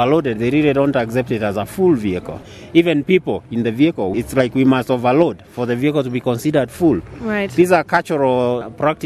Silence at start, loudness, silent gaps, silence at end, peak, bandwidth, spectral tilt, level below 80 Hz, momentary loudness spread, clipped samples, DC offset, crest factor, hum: 0 s; -17 LUFS; none; 0 s; 0 dBFS; 14 kHz; -7 dB/octave; -46 dBFS; 7 LU; under 0.1%; under 0.1%; 16 dB; none